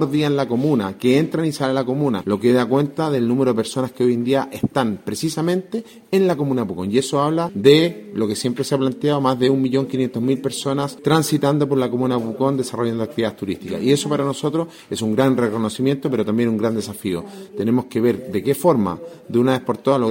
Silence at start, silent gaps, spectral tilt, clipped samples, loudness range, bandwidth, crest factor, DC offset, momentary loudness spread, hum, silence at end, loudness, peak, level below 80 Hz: 0 s; none; -6 dB/octave; under 0.1%; 2 LU; 16.5 kHz; 20 dB; under 0.1%; 7 LU; none; 0 s; -20 LUFS; 0 dBFS; -58 dBFS